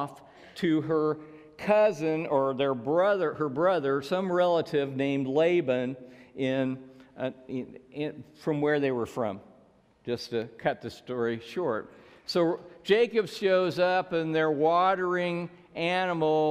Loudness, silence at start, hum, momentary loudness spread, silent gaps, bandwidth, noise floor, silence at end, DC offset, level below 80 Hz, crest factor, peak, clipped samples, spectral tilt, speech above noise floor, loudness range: -28 LUFS; 0 s; none; 12 LU; none; 14.5 kHz; -61 dBFS; 0 s; under 0.1%; -70 dBFS; 18 dB; -10 dBFS; under 0.1%; -6.5 dB/octave; 33 dB; 6 LU